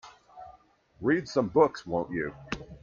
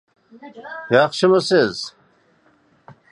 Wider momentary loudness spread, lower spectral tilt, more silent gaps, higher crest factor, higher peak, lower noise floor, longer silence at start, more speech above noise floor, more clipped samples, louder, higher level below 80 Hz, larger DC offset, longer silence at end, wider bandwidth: first, 25 LU vs 19 LU; first, -6.5 dB/octave vs -5 dB/octave; neither; about the same, 22 dB vs 20 dB; second, -8 dBFS vs -2 dBFS; about the same, -60 dBFS vs -58 dBFS; second, 0.05 s vs 0.4 s; second, 32 dB vs 40 dB; neither; second, -29 LUFS vs -17 LUFS; first, -58 dBFS vs -66 dBFS; neither; second, 0.05 s vs 0.2 s; second, 7.2 kHz vs 11 kHz